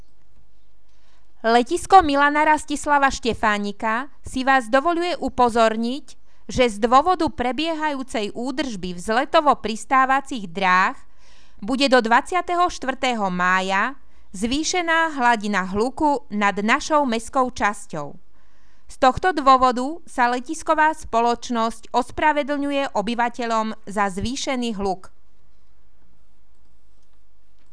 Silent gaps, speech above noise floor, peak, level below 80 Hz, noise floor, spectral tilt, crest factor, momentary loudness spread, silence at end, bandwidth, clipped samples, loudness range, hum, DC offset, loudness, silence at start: none; 40 dB; 0 dBFS; -46 dBFS; -60 dBFS; -4 dB/octave; 20 dB; 10 LU; 2.65 s; 11 kHz; under 0.1%; 4 LU; none; 2%; -20 LUFS; 1.45 s